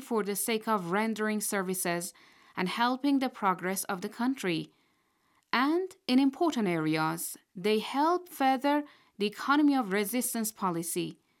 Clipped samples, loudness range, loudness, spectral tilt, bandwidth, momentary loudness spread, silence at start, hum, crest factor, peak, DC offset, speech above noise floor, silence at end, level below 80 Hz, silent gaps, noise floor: under 0.1%; 2 LU; -30 LUFS; -4 dB/octave; 18 kHz; 9 LU; 0 s; none; 20 dB; -10 dBFS; under 0.1%; 42 dB; 0.25 s; -82 dBFS; none; -72 dBFS